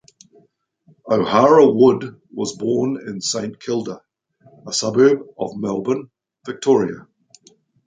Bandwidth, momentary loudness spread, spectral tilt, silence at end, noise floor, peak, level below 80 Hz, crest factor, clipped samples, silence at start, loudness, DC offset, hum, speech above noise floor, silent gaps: 9.4 kHz; 17 LU; -5 dB/octave; 0.85 s; -59 dBFS; -2 dBFS; -62 dBFS; 18 dB; under 0.1%; 1.05 s; -18 LUFS; under 0.1%; none; 41 dB; none